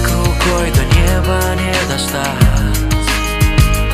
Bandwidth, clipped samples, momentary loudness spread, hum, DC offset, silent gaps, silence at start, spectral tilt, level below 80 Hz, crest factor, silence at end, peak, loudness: 16 kHz; under 0.1%; 3 LU; none; under 0.1%; none; 0 s; -4.5 dB/octave; -16 dBFS; 12 dB; 0 s; 0 dBFS; -14 LUFS